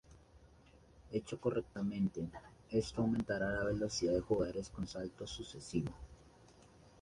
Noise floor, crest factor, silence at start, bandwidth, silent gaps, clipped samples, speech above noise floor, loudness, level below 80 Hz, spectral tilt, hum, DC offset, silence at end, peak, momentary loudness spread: -63 dBFS; 18 dB; 0.1 s; 11.5 kHz; none; under 0.1%; 25 dB; -39 LUFS; -58 dBFS; -5.5 dB/octave; none; under 0.1%; 0.1 s; -22 dBFS; 11 LU